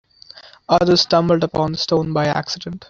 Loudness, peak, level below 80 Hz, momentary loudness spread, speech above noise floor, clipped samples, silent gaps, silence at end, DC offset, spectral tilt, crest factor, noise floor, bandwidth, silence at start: -17 LUFS; -2 dBFS; -48 dBFS; 9 LU; 26 dB; under 0.1%; none; 0.05 s; under 0.1%; -5.5 dB/octave; 16 dB; -44 dBFS; 7.6 kHz; 0.35 s